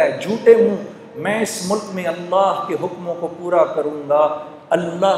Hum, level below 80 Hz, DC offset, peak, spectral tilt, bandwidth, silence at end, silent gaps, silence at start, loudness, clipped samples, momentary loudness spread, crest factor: none; -68 dBFS; under 0.1%; 0 dBFS; -5 dB/octave; 14 kHz; 0 s; none; 0 s; -18 LUFS; under 0.1%; 12 LU; 18 dB